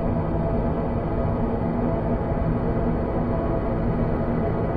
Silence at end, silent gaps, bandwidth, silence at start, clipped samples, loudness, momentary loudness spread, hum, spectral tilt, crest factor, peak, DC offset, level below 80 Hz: 0 s; none; 4.9 kHz; 0 s; under 0.1%; -25 LUFS; 1 LU; none; -11.5 dB/octave; 12 dB; -10 dBFS; under 0.1%; -30 dBFS